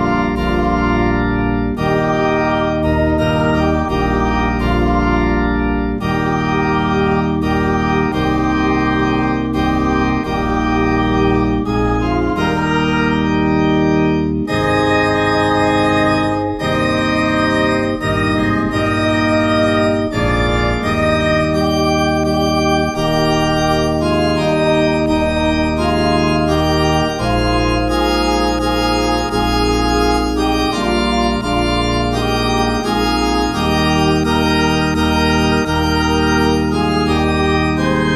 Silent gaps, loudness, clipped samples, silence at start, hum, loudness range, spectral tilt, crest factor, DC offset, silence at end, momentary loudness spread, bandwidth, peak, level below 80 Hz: none; -15 LUFS; under 0.1%; 0 s; none; 1 LU; -6 dB/octave; 14 dB; under 0.1%; 0 s; 3 LU; 14 kHz; -2 dBFS; -26 dBFS